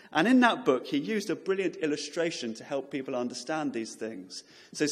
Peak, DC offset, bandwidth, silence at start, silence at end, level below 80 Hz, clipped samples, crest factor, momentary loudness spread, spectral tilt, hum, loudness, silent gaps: -8 dBFS; under 0.1%; 14 kHz; 0.05 s; 0 s; -80 dBFS; under 0.1%; 22 dB; 16 LU; -4 dB/octave; none; -29 LUFS; none